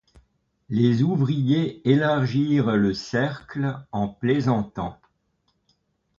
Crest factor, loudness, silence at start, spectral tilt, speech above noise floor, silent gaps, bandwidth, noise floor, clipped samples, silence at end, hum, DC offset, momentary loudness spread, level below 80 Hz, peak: 18 dB; -23 LUFS; 0.7 s; -8 dB/octave; 49 dB; none; 7.4 kHz; -71 dBFS; under 0.1%; 1.25 s; none; under 0.1%; 9 LU; -54 dBFS; -6 dBFS